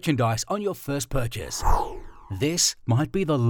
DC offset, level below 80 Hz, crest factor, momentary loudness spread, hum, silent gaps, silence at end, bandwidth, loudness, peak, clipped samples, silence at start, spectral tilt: under 0.1%; -34 dBFS; 16 dB; 9 LU; none; none; 0 s; 19.5 kHz; -25 LUFS; -8 dBFS; under 0.1%; 0.05 s; -4.5 dB/octave